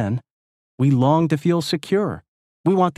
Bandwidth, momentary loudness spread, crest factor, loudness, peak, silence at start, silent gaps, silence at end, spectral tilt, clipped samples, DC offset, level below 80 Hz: 13.5 kHz; 10 LU; 16 dB; -20 LUFS; -4 dBFS; 0 s; 0.31-0.78 s, 2.28-2.64 s; 0.05 s; -7.5 dB/octave; under 0.1%; under 0.1%; -58 dBFS